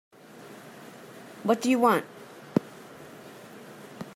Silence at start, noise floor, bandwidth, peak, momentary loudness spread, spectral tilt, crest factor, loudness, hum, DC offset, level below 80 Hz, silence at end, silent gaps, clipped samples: 0.45 s; -48 dBFS; 16 kHz; -6 dBFS; 24 LU; -5.5 dB/octave; 26 dB; -26 LUFS; none; under 0.1%; -74 dBFS; 0.05 s; none; under 0.1%